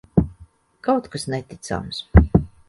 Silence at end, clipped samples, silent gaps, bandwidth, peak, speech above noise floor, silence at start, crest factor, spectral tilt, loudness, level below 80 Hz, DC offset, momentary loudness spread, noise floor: 0.2 s; under 0.1%; none; 11.5 kHz; 0 dBFS; 30 dB; 0.15 s; 20 dB; -7 dB/octave; -22 LUFS; -26 dBFS; under 0.1%; 14 LU; -50 dBFS